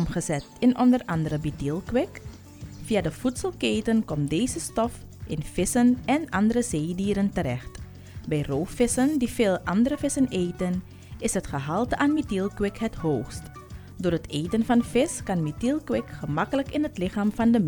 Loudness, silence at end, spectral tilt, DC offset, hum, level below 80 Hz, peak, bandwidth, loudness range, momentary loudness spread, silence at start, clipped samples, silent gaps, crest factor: -26 LUFS; 0 s; -5.5 dB/octave; under 0.1%; none; -46 dBFS; -8 dBFS; 19.5 kHz; 2 LU; 12 LU; 0 s; under 0.1%; none; 16 dB